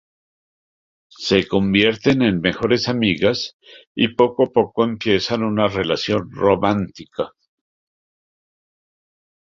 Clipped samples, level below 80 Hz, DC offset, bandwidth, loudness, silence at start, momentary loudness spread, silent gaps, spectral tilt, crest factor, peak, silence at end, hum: under 0.1%; -50 dBFS; under 0.1%; 7.6 kHz; -19 LUFS; 1.2 s; 12 LU; 3.54-3.60 s, 3.87-3.95 s; -6 dB/octave; 20 dB; -2 dBFS; 2.25 s; none